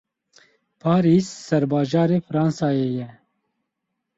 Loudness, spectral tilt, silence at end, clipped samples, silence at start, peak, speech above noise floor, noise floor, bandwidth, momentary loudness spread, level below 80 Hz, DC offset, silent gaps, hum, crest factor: -21 LUFS; -7.5 dB/octave; 1.05 s; under 0.1%; 0.85 s; -6 dBFS; 59 dB; -79 dBFS; 8 kHz; 10 LU; -60 dBFS; under 0.1%; none; none; 18 dB